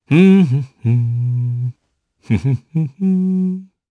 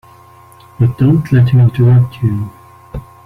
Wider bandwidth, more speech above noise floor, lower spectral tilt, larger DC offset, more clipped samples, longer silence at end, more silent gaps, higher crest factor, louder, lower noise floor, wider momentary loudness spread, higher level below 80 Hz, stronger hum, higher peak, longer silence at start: first, 6.2 kHz vs 4.3 kHz; first, 52 dB vs 31 dB; about the same, -9.5 dB/octave vs -10 dB/octave; neither; neither; about the same, 0.25 s vs 0.25 s; neither; about the same, 16 dB vs 12 dB; second, -17 LUFS vs -12 LUFS; first, -66 dBFS vs -41 dBFS; second, 12 LU vs 21 LU; second, -50 dBFS vs -38 dBFS; neither; about the same, 0 dBFS vs -2 dBFS; second, 0.1 s vs 0.8 s